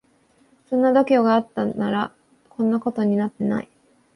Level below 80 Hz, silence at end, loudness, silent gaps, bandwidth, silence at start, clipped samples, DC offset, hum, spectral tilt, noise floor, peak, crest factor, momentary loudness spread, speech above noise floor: -64 dBFS; 0.5 s; -21 LUFS; none; 10.5 kHz; 0.7 s; under 0.1%; under 0.1%; none; -8 dB/octave; -60 dBFS; -6 dBFS; 16 dB; 11 LU; 40 dB